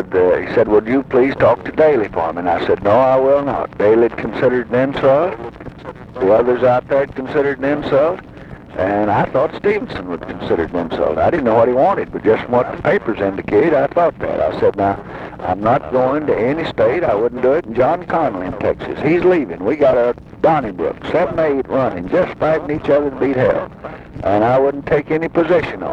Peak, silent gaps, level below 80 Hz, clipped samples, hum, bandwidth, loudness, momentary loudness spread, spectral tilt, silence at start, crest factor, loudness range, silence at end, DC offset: -2 dBFS; none; -42 dBFS; under 0.1%; none; 7.2 kHz; -16 LUFS; 8 LU; -8.5 dB/octave; 0 s; 14 dB; 3 LU; 0 s; under 0.1%